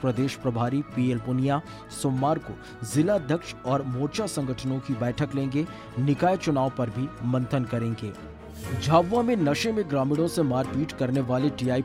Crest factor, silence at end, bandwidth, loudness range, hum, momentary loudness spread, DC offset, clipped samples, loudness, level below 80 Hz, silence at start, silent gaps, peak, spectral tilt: 18 dB; 0 s; 15.5 kHz; 3 LU; none; 7 LU; under 0.1%; under 0.1%; -26 LUFS; -52 dBFS; 0 s; none; -8 dBFS; -6.5 dB/octave